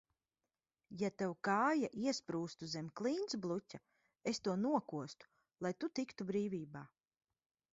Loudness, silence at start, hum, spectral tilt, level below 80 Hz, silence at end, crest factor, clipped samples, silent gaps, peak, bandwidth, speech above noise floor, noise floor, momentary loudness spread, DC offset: -40 LUFS; 0.9 s; none; -4.5 dB/octave; -80 dBFS; 0.9 s; 20 dB; under 0.1%; none; -22 dBFS; 7.6 kHz; over 50 dB; under -90 dBFS; 16 LU; under 0.1%